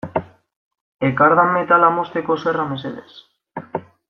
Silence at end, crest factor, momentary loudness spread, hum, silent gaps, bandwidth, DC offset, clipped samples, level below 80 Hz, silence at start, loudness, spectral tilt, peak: 0.3 s; 18 dB; 18 LU; none; 0.56-0.71 s, 0.81-0.99 s; 6.4 kHz; under 0.1%; under 0.1%; -60 dBFS; 0.05 s; -17 LUFS; -8 dB/octave; -2 dBFS